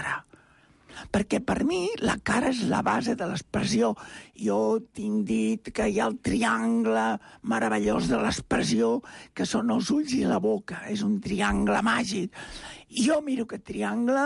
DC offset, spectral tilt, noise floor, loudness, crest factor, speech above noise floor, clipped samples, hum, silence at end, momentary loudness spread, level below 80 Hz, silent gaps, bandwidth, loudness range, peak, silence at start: under 0.1%; -5 dB/octave; -59 dBFS; -27 LUFS; 14 dB; 32 dB; under 0.1%; none; 0 s; 9 LU; -50 dBFS; none; 11.5 kHz; 1 LU; -12 dBFS; 0 s